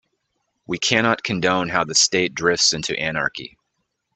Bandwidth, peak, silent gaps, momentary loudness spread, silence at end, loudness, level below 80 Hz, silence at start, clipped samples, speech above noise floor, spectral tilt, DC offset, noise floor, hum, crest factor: 9.4 kHz; 0 dBFS; none; 10 LU; 0.7 s; -19 LUFS; -56 dBFS; 0.7 s; under 0.1%; 54 dB; -2 dB/octave; under 0.1%; -75 dBFS; none; 22 dB